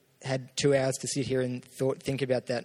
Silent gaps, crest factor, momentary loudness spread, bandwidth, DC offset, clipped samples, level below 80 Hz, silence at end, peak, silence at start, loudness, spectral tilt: none; 18 dB; 8 LU; 15.5 kHz; under 0.1%; under 0.1%; -64 dBFS; 0 s; -12 dBFS; 0.2 s; -30 LUFS; -5 dB/octave